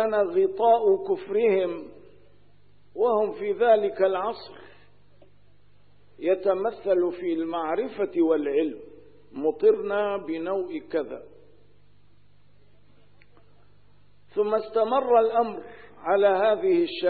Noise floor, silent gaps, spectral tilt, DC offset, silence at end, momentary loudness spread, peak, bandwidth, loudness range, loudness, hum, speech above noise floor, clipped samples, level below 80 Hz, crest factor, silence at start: -61 dBFS; none; -9.5 dB/octave; 0.3%; 0 s; 14 LU; -8 dBFS; 4.8 kHz; 9 LU; -24 LUFS; 50 Hz at -65 dBFS; 37 dB; under 0.1%; -66 dBFS; 18 dB; 0 s